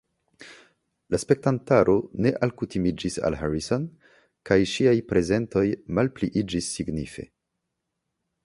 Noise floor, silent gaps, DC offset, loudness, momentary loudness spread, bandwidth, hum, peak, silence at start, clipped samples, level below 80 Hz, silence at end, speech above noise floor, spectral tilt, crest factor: -81 dBFS; none; under 0.1%; -25 LUFS; 9 LU; 11.5 kHz; none; -4 dBFS; 0.4 s; under 0.1%; -48 dBFS; 1.2 s; 57 dB; -6 dB/octave; 22 dB